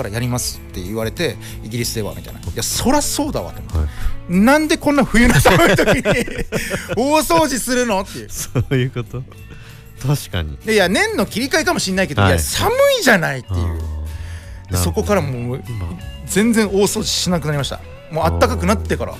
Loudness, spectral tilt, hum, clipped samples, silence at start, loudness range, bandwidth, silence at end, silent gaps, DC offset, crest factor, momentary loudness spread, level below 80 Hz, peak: -17 LUFS; -4.5 dB/octave; none; under 0.1%; 0 s; 6 LU; 16 kHz; 0 s; none; under 0.1%; 14 dB; 15 LU; -30 dBFS; -4 dBFS